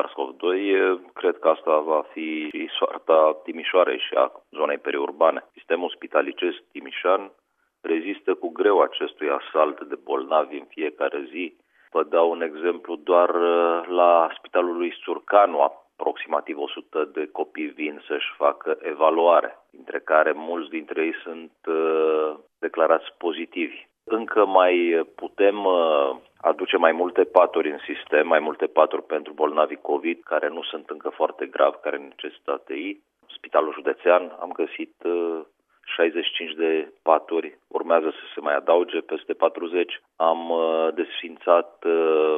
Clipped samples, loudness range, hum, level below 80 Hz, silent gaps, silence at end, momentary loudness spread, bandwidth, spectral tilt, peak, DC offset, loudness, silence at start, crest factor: under 0.1%; 5 LU; none; -80 dBFS; none; 0 s; 12 LU; 3.8 kHz; -6 dB/octave; 0 dBFS; under 0.1%; -23 LUFS; 0 s; 22 dB